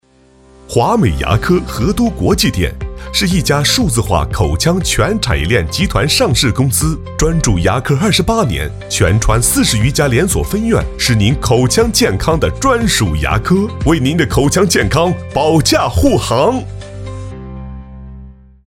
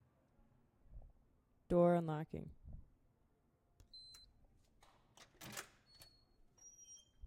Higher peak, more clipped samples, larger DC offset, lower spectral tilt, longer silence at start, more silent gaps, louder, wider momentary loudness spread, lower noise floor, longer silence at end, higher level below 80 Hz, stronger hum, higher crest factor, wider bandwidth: first, 0 dBFS vs -22 dBFS; neither; neither; second, -4.5 dB/octave vs -6.5 dB/octave; second, 0.7 s vs 0.9 s; neither; first, -13 LUFS vs -39 LUFS; second, 8 LU vs 28 LU; second, -46 dBFS vs -77 dBFS; about the same, 0.35 s vs 0.3 s; first, -24 dBFS vs -66 dBFS; neither; second, 14 dB vs 24 dB; about the same, 17 kHz vs 16 kHz